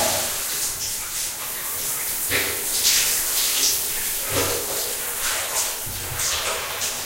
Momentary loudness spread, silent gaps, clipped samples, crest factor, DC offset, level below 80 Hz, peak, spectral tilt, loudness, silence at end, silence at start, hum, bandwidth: 7 LU; none; under 0.1%; 18 dB; under 0.1%; -46 dBFS; -6 dBFS; 0 dB/octave; -21 LUFS; 0 s; 0 s; none; 16 kHz